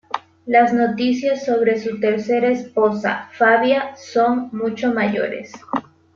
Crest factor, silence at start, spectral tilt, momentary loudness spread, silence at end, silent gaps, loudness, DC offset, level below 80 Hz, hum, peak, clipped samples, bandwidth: 16 dB; 0.15 s; -5.5 dB/octave; 12 LU; 0.35 s; none; -19 LUFS; under 0.1%; -64 dBFS; none; -2 dBFS; under 0.1%; 7.2 kHz